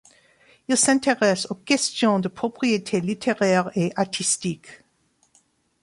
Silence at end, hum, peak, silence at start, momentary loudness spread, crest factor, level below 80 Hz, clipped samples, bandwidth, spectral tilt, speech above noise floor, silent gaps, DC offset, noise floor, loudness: 1.1 s; none; -4 dBFS; 0.7 s; 8 LU; 18 dB; -64 dBFS; under 0.1%; 11.5 kHz; -3.5 dB/octave; 43 dB; none; under 0.1%; -66 dBFS; -22 LUFS